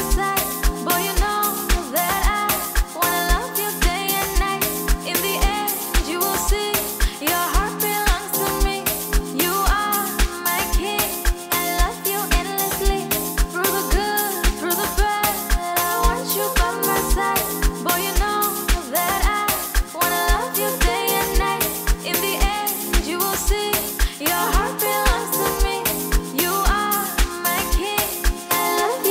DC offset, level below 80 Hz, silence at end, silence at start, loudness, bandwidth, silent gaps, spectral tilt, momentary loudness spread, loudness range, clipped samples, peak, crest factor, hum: under 0.1%; -24 dBFS; 0 s; 0 s; -20 LUFS; 16.5 kHz; none; -3 dB/octave; 3 LU; 1 LU; under 0.1%; -2 dBFS; 18 dB; none